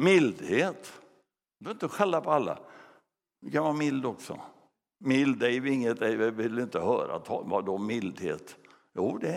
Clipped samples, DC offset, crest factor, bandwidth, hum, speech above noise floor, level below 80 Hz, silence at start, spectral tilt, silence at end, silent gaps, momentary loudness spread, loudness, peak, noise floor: under 0.1%; under 0.1%; 20 dB; 14.5 kHz; none; 41 dB; -74 dBFS; 0 s; -6 dB/octave; 0 s; none; 15 LU; -29 LUFS; -8 dBFS; -69 dBFS